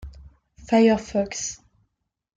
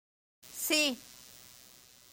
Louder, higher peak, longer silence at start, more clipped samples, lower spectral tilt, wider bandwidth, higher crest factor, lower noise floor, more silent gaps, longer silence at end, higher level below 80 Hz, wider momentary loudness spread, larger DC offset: first, -22 LUFS vs -30 LUFS; first, -6 dBFS vs -16 dBFS; second, 0 s vs 0.45 s; neither; first, -4.5 dB/octave vs 0 dB/octave; second, 9.2 kHz vs 17 kHz; about the same, 18 dB vs 22 dB; first, -80 dBFS vs -58 dBFS; neither; about the same, 0.8 s vs 0.7 s; first, -48 dBFS vs -76 dBFS; second, 14 LU vs 25 LU; neither